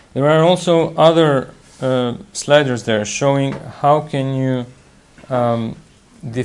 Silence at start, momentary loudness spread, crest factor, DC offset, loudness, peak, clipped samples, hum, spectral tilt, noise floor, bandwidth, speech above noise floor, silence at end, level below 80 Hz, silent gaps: 0.15 s; 13 LU; 16 dB; under 0.1%; -16 LUFS; 0 dBFS; under 0.1%; none; -5.5 dB/octave; -46 dBFS; 11.5 kHz; 30 dB; 0 s; -52 dBFS; none